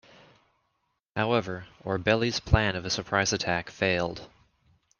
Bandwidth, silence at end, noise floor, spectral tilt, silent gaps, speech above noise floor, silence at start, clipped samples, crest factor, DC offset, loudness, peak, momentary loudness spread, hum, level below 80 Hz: 10.5 kHz; 0.75 s; -77 dBFS; -4.5 dB/octave; none; 50 dB; 1.15 s; under 0.1%; 22 dB; under 0.1%; -27 LUFS; -8 dBFS; 11 LU; none; -44 dBFS